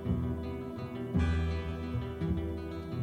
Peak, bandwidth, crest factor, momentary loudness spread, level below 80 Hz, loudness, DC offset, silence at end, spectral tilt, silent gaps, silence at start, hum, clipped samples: -18 dBFS; 8.8 kHz; 16 dB; 8 LU; -40 dBFS; -35 LUFS; under 0.1%; 0 s; -8.5 dB/octave; none; 0 s; none; under 0.1%